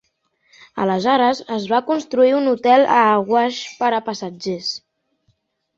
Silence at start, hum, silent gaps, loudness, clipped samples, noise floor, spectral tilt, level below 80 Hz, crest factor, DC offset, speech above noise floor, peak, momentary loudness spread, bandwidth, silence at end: 0.75 s; none; none; -18 LUFS; under 0.1%; -66 dBFS; -5 dB/octave; -66 dBFS; 16 dB; under 0.1%; 49 dB; -2 dBFS; 12 LU; 7.8 kHz; 1 s